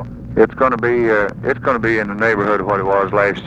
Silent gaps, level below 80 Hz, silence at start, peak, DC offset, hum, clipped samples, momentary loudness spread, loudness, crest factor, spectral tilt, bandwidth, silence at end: none; -40 dBFS; 0 s; 0 dBFS; under 0.1%; none; under 0.1%; 3 LU; -16 LUFS; 16 dB; -7.5 dB/octave; 8.2 kHz; 0 s